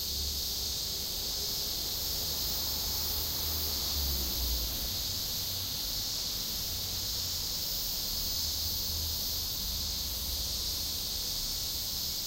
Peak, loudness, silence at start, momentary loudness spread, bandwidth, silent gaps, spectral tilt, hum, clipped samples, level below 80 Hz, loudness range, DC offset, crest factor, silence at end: -20 dBFS; -31 LUFS; 0 s; 2 LU; 16 kHz; none; -1.5 dB/octave; none; under 0.1%; -44 dBFS; 1 LU; under 0.1%; 14 dB; 0 s